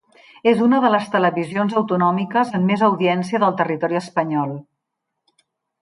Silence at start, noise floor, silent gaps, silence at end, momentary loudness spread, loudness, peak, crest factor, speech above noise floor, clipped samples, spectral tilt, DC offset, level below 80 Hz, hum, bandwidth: 0.45 s; -79 dBFS; none; 1.2 s; 6 LU; -19 LUFS; -4 dBFS; 16 dB; 61 dB; under 0.1%; -7 dB/octave; under 0.1%; -68 dBFS; none; 11 kHz